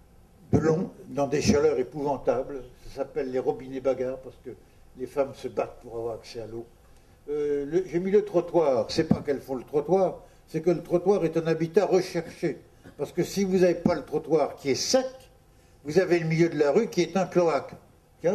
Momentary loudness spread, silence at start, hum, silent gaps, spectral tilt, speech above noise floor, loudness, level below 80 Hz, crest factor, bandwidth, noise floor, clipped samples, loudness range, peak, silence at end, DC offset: 14 LU; 0.5 s; none; none; -6 dB/octave; 30 dB; -26 LUFS; -52 dBFS; 18 dB; 13.5 kHz; -56 dBFS; under 0.1%; 6 LU; -8 dBFS; 0 s; under 0.1%